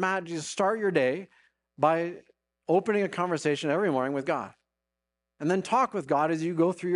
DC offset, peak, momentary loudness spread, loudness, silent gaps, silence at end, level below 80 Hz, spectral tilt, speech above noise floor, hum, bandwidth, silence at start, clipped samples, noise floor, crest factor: under 0.1%; -10 dBFS; 9 LU; -28 LUFS; none; 0 s; -76 dBFS; -5.5 dB/octave; 60 dB; none; 11 kHz; 0 s; under 0.1%; -86 dBFS; 18 dB